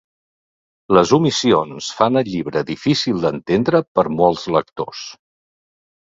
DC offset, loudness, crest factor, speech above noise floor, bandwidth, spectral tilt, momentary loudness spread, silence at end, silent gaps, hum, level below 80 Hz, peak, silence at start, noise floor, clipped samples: under 0.1%; -18 LUFS; 18 dB; over 73 dB; 7.8 kHz; -5.5 dB/octave; 12 LU; 0.95 s; 3.88-3.95 s; none; -52 dBFS; 0 dBFS; 0.9 s; under -90 dBFS; under 0.1%